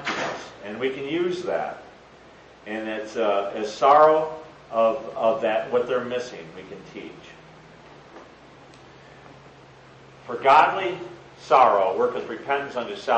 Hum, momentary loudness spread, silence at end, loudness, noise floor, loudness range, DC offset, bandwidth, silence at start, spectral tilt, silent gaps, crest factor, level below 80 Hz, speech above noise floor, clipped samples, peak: none; 23 LU; 0 s; -22 LUFS; -49 dBFS; 13 LU; under 0.1%; 8.6 kHz; 0 s; -4.5 dB/octave; none; 20 dB; -64 dBFS; 26 dB; under 0.1%; -4 dBFS